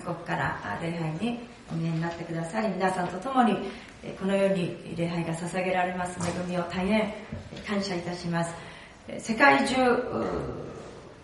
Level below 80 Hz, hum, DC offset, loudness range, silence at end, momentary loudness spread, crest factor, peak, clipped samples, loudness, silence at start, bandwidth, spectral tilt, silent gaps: -54 dBFS; none; under 0.1%; 4 LU; 0 s; 15 LU; 24 dB; -4 dBFS; under 0.1%; -28 LUFS; 0 s; 11.5 kHz; -5.5 dB/octave; none